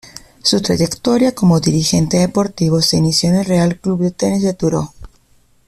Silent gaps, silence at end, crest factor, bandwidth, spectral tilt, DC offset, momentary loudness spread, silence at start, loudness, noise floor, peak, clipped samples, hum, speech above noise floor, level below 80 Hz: none; 0.6 s; 14 dB; 14.5 kHz; -5.5 dB/octave; under 0.1%; 5 LU; 0.05 s; -15 LUFS; -53 dBFS; -2 dBFS; under 0.1%; none; 38 dB; -42 dBFS